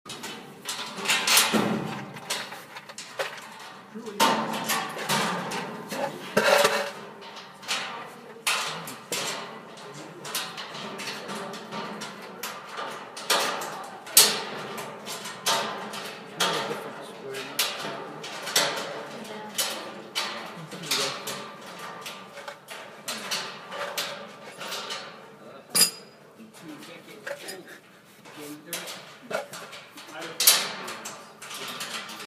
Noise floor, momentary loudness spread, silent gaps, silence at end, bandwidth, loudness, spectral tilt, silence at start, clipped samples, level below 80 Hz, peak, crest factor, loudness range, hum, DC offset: -52 dBFS; 20 LU; none; 0 s; 15.5 kHz; -27 LUFS; -1 dB/octave; 0.05 s; under 0.1%; -76 dBFS; 0 dBFS; 30 dB; 10 LU; none; under 0.1%